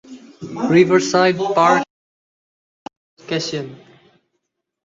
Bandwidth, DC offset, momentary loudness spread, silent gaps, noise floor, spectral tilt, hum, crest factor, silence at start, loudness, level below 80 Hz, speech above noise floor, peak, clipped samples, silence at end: 7.8 kHz; under 0.1%; 19 LU; 1.90-2.86 s, 2.97-3.17 s; -75 dBFS; -5 dB/octave; none; 18 dB; 0.1 s; -16 LUFS; -62 dBFS; 59 dB; -2 dBFS; under 0.1%; 1.1 s